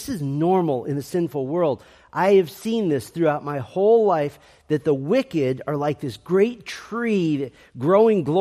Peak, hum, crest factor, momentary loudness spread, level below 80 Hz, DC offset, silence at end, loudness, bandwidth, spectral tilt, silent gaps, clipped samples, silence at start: -4 dBFS; none; 16 dB; 10 LU; -60 dBFS; under 0.1%; 0 s; -22 LUFS; 15 kHz; -7 dB/octave; none; under 0.1%; 0 s